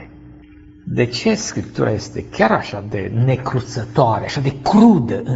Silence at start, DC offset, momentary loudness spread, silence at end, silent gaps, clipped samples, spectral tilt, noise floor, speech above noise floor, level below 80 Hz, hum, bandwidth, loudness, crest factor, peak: 0 s; under 0.1%; 13 LU; 0 s; none; under 0.1%; -6 dB/octave; -42 dBFS; 26 dB; -44 dBFS; none; 8 kHz; -18 LUFS; 18 dB; 0 dBFS